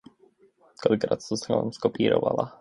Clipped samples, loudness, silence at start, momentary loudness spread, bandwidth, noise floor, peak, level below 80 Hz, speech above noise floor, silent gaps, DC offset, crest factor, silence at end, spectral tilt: under 0.1%; -26 LUFS; 0.8 s; 5 LU; 11 kHz; -61 dBFS; -6 dBFS; -62 dBFS; 36 dB; none; under 0.1%; 20 dB; 0.1 s; -6 dB/octave